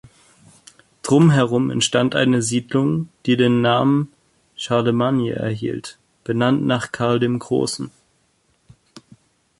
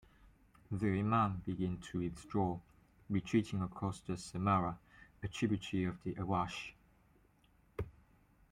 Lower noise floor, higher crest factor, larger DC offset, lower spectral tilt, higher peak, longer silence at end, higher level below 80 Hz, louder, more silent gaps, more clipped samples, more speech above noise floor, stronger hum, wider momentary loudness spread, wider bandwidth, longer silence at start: second, -63 dBFS vs -70 dBFS; about the same, 18 dB vs 20 dB; neither; second, -5.5 dB/octave vs -7 dB/octave; first, -2 dBFS vs -20 dBFS; about the same, 0.6 s vs 0.6 s; first, -56 dBFS vs -62 dBFS; first, -19 LUFS vs -38 LUFS; neither; neither; first, 45 dB vs 33 dB; neither; about the same, 14 LU vs 14 LU; about the same, 11.5 kHz vs 11.5 kHz; first, 1.05 s vs 0.7 s